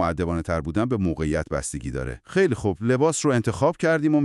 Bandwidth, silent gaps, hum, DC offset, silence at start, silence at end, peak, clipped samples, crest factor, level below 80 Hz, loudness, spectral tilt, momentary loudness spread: 12 kHz; none; none; under 0.1%; 0 s; 0 s; -6 dBFS; under 0.1%; 16 dB; -40 dBFS; -24 LUFS; -6 dB/octave; 8 LU